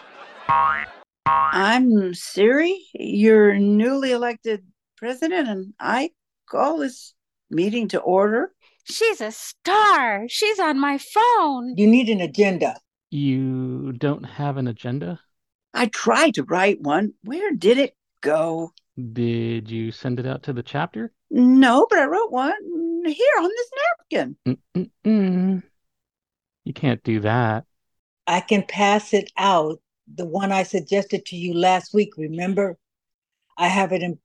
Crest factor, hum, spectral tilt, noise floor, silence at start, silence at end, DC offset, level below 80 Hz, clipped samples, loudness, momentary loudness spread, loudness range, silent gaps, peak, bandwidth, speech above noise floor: 18 dB; none; -5.5 dB/octave; -90 dBFS; 0.2 s; 0.1 s; under 0.1%; -64 dBFS; under 0.1%; -21 LUFS; 13 LU; 6 LU; 15.55-15.59 s, 27.99-28.17 s, 33.14-33.22 s; -2 dBFS; 12.5 kHz; 70 dB